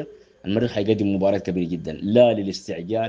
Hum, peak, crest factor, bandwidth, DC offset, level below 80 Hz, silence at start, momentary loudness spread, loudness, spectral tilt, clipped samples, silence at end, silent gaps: none; -2 dBFS; 20 dB; 7.8 kHz; under 0.1%; -56 dBFS; 0 s; 12 LU; -22 LUFS; -7 dB/octave; under 0.1%; 0 s; none